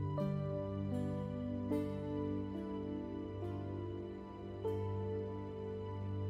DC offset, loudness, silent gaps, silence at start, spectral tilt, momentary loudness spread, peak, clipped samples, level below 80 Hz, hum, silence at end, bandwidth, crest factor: under 0.1%; -41 LUFS; none; 0 s; -9.5 dB/octave; 6 LU; -26 dBFS; under 0.1%; -60 dBFS; 50 Hz at -65 dBFS; 0 s; 9.4 kHz; 14 dB